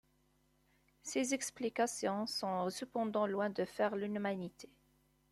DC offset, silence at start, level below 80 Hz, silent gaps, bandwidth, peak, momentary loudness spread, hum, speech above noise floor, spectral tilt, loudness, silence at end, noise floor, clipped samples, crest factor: under 0.1%; 1.05 s; -76 dBFS; none; 14 kHz; -22 dBFS; 6 LU; none; 37 dB; -4 dB/octave; -38 LUFS; 0.65 s; -74 dBFS; under 0.1%; 18 dB